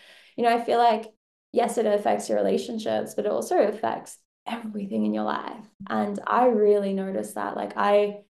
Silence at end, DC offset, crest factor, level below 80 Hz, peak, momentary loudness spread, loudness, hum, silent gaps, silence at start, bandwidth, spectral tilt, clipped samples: 0.2 s; under 0.1%; 18 dB; -74 dBFS; -8 dBFS; 13 LU; -25 LUFS; none; 1.17-1.53 s, 4.25-4.46 s, 5.74-5.80 s; 0.4 s; 12.5 kHz; -5 dB/octave; under 0.1%